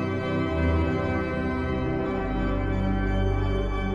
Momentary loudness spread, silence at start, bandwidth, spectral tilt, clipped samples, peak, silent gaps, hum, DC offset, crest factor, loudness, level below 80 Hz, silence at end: 3 LU; 0 s; 7.4 kHz; -8.5 dB/octave; under 0.1%; -12 dBFS; none; none; under 0.1%; 12 dB; -27 LUFS; -32 dBFS; 0 s